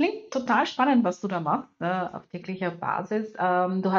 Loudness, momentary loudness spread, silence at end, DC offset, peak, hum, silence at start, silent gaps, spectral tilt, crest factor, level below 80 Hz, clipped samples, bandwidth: -26 LUFS; 9 LU; 0 s; under 0.1%; -6 dBFS; none; 0 s; none; -6.5 dB/octave; 18 dB; -72 dBFS; under 0.1%; 7.4 kHz